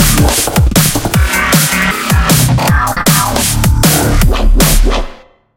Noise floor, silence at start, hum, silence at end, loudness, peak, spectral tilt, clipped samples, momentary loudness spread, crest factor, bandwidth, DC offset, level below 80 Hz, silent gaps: -32 dBFS; 0 s; none; 0.4 s; -10 LUFS; 0 dBFS; -4 dB/octave; 0.1%; 3 LU; 10 dB; 17.5 kHz; under 0.1%; -14 dBFS; none